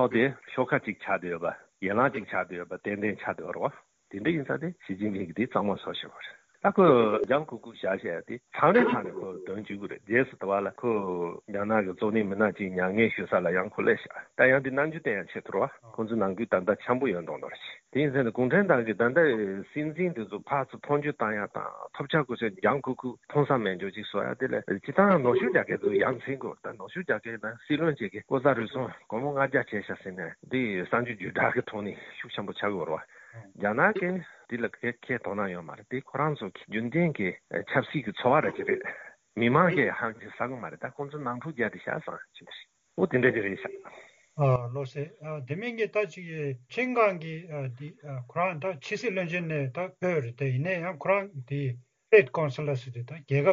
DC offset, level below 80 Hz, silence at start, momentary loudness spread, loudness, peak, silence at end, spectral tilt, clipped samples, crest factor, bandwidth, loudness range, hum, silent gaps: under 0.1%; -70 dBFS; 0 s; 14 LU; -29 LUFS; -6 dBFS; 0 s; -5.5 dB/octave; under 0.1%; 22 dB; 7.6 kHz; 5 LU; none; none